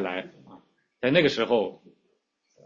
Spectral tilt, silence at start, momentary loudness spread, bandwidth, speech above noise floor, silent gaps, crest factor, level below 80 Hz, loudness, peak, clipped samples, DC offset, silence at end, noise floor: -6 dB/octave; 0 s; 13 LU; 7.4 kHz; 48 dB; none; 22 dB; -66 dBFS; -25 LUFS; -6 dBFS; under 0.1%; under 0.1%; 0.9 s; -72 dBFS